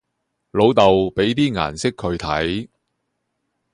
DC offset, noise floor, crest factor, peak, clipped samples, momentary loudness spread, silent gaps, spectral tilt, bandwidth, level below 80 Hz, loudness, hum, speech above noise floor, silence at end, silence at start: under 0.1%; -75 dBFS; 20 dB; 0 dBFS; under 0.1%; 11 LU; none; -5.5 dB/octave; 11 kHz; -44 dBFS; -19 LUFS; none; 57 dB; 1.05 s; 0.55 s